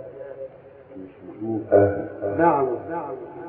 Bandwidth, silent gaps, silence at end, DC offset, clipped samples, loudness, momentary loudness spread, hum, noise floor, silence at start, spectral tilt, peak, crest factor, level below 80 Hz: 3.5 kHz; none; 0 s; under 0.1%; under 0.1%; -23 LUFS; 22 LU; none; -45 dBFS; 0 s; -12.5 dB/octave; -4 dBFS; 20 dB; -60 dBFS